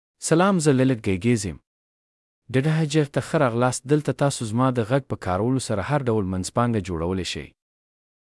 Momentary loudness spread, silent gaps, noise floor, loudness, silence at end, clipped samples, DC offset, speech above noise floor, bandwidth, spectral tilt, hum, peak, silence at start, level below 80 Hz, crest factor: 7 LU; 1.67-2.42 s; under -90 dBFS; -23 LUFS; 0.85 s; under 0.1%; under 0.1%; over 68 dB; 12 kHz; -6 dB/octave; none; -6 dBFS; 0.2 s; -54 dBFS; 18 dB